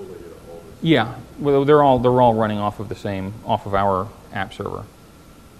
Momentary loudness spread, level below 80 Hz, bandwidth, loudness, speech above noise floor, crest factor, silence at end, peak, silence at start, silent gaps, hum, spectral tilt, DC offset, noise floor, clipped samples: 21 LU; -46 dBFS; 13 kHz; -19 LUFS; 27 dB; 18 dB; 0.75 s; -2 dBFS; 0 s; none; none; -7.5 dB/octave; 0.2%; -45 dBFS; under 0.1%